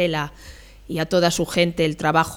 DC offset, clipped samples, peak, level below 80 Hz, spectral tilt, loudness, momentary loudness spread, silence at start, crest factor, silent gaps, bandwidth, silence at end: under 0.1%; under 0.1%; -4 dBFS; -46 dBFS; -4.5 dB/octave; -21 LUFS; 10 LU; 0 s; 16 dB; none; 18.5 kHz; 0 s